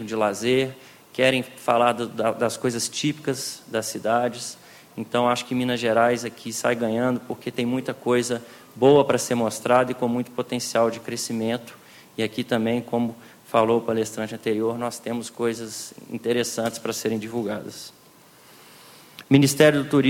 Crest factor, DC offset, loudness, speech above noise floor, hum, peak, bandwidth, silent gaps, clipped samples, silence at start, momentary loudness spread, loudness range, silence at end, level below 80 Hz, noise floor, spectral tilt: 20 dB; under 0.1%; -23 LUFS; 29 dB; none; -4 dBFS; 17 kHz; none; under 0.1%; 0 s; 13 LU; 5 LU; 0 s; -64 dBFS; -52 dBFS; -4.5 dB/octave